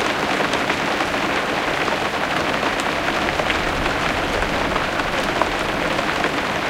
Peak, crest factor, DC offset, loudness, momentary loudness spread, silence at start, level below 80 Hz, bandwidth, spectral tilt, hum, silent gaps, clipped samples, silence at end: -2 dBFS; 18 dB; under 0.1%; -20 LUFS; 1 LU; 0 s; -38 dBFS; 17 kHz; -3.5 dB/octave; none; none; under 0.1%; 0 s